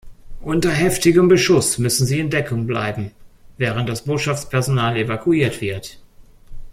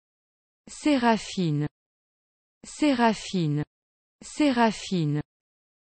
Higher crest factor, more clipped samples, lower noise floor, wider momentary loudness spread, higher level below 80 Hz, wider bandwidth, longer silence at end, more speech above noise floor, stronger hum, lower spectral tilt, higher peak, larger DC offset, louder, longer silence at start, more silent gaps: about the same, 16 dB vs 18 dB; neither; second, -43 dBFS vs under -90 dBFS; second, 13 LU vs 17 LU; first, -40 dBFS vs -60 dBFS; first, 16 kHz vs 8.8 kHz; second, 0 s vs 0.75 s; second, 25 dB vs over 65 dB; neither; about the same, -5 dB/octave vs -5.5 dB/octave; first, -2 dBFS vs -8 dBFS; neither; first, -18 LUFS vs -25 LUFS; second, 0.05 s vs 0.7 s; second, none vs 1.71-2.61 s, 3.67-4.19 s